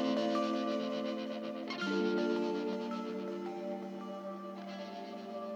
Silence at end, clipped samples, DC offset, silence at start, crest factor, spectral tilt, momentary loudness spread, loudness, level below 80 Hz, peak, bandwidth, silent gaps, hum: 0 s; under 0.1%; under 0.1%; 0 s; 16 dB; -6 dB/octave; 11 LU; -37 LUFS; under -90 dBFS; -22 dBFS; 18.5 kHz; none; none